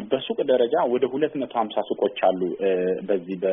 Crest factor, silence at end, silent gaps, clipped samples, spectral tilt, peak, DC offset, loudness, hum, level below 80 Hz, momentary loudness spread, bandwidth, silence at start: 16 dB; 0 s; none; under 0.1%; -4 dB/octave; -8 dBFS; under 0.1%; -24 LUFS; none; -68 dBFS; 5 LU; 3.8 kHz; 0 s